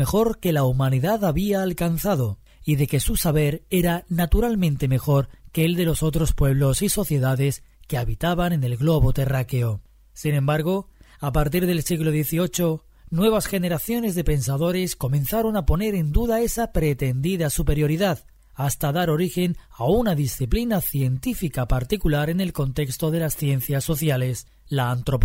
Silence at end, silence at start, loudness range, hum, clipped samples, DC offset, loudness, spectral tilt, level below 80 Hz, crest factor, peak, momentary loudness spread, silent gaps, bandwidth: 0 s; 0 s; 2 LU; none; under 0.1%; under 0.1%; -23 LUFS; -6 dB/octave; -32 dBFS; 14 dB; -6 dBFS; 5 LU; none; 16.5 kHz